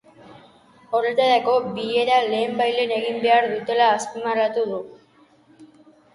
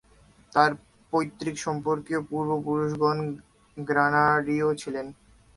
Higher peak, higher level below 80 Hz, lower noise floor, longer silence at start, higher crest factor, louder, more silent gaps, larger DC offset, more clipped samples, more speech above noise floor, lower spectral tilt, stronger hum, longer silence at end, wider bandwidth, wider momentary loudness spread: about the same, -6 dBFS vs -4 dBFS; second, -70 dBFS vs -60 dBFS; about the same, -55 dBFS vs -57 dBFS; second, 0.3 s vs 0.55 s; second, 16 dB vs 22 dB; first, -21 LUFS vs -26 LUFS; neither; neither; neither; about the same, 35 dB vs 32 dB; second, -3.5 dB/octave vs -6 dB/octave; neither; about the same, 0.5 s vs 0.45 s; about the same, 11.5 kHz vs 11.5 kHz; second, 7 LU vs 14 LU